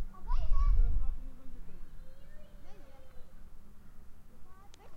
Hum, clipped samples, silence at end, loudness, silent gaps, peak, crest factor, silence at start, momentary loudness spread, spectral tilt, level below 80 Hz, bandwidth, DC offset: none; under 0.1%; 0 s; -36 LUFS; none; -14 dBFS; 16 dB; 0 s; 26 LU; -7.5 dB/octave; -34 dBFS; 3 kHz; under 0.1%